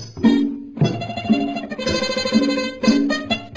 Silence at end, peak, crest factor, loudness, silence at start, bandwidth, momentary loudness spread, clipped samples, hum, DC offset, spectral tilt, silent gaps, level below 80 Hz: 0 s; -4 dBFS; 16 dB; -20 LUFS; 0 s; 7.8 kHz; 7 LU; under 0.1%; none; under 0.1%; -5.5 dB/octave; none; -46 dBFS